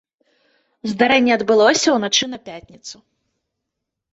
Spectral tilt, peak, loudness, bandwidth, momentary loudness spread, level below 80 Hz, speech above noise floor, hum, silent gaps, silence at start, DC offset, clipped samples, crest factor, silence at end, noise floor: -2.5 dB/octave; -2 dBFS; -16 LUFS; 8.2 kHz; 22 LU; -62 dBFS; 63 dB; none; none; 0.85 s; under 0.1%; under 0.1%; 18 dB; 1.2 s; -80 dBFS